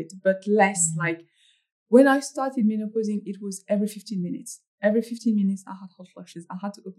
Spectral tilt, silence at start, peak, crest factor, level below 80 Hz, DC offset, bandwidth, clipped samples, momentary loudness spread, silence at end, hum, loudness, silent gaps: -5 dB/octave; 0 s; -4 dBFS; 20 dB; -84 dBFS; under 0.1%; 13 kHz; under 0.1%; 19 LU; 0.05 s; none; -24 LUFS; 1.72-1.86 s, 4.67-4.78 s